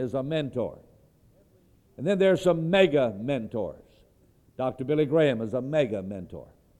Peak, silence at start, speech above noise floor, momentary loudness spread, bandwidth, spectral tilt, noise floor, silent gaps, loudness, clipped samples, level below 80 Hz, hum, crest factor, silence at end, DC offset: -6 dBFS; 0 s; 35 dB; 14 LU; 12 kHz; -7 dB/octave; -61 dBFS; none; -26 LUFS; under 0.1%; -60 dBFS; none; 20 dB; 0.35 s; under 0.1%